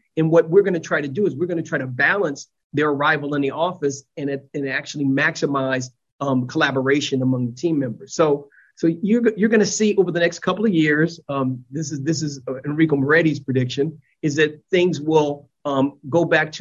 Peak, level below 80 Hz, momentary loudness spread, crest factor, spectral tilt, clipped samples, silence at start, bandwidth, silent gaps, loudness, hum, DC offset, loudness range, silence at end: -4 dBFS; -62 dBFS; 9 LU; 16 dB; -5.5 dB/octave; under 0.1%; 0.15 s; 8 kHz; 2.64-2.70 s, 6.12-6.19 s; -20 LUFS; none; under 0.1%; 3 LU; 0 s